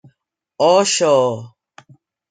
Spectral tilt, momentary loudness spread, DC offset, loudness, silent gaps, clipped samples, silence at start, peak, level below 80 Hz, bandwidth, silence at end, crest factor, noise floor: -3 dB/octave; 8 LU; under 0.1%; -15 LUFS; none; under 0.1%; 0.6 s; -2 dBFS; -70 dBFS; 9.6 kHz; 0.85 s; 16 dB; -67 dBFS